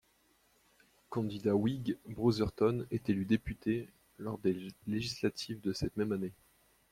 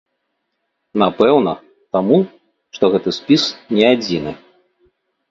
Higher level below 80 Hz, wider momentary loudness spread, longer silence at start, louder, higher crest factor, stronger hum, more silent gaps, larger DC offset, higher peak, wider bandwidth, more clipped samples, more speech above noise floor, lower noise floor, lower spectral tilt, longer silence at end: about the same, -58 dBFS vs -54 dBFS; second, 9 LU vs 12 LU; first, 1.1 s vs 0.95 s; second, -35 LUFS vs -16 LUFS; about the same, 20 dB vs 18 dB; neither; neither; neither; second, -16 dBFS vs 0 dBFS; first, 16 kHz vs 7.8 kHz; neither; second, 37 dB vs 57 dB; about the same, -71 dBFS vs -72 dBFS; about the same, -6.5 dB/octave vs -6 dB/octave; second, 0.6 s vs 0.95 s